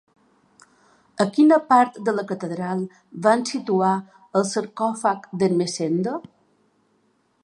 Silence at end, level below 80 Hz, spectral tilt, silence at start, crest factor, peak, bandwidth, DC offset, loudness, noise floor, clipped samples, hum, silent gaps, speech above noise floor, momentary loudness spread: 1.25 s; -72 dBFS; -5.5 dB/octave; 1.15 s; 20 dB; -2 dBFS; 11.5 kHz; under 0.1%; -22 LUFS; -65 dBFS; under 0.1%; none; none; 44 dB; 12 LU